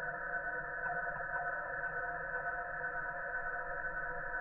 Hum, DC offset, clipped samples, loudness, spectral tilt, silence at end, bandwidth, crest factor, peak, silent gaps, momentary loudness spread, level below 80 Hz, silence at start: none; under 0.1%; under 0.1%; -39 LUFS; -5.5 dB/octave; 0 s; 3 kHz; 14 dB; -26 dBFS; none; 2 LU; -56 dBFS; 0 s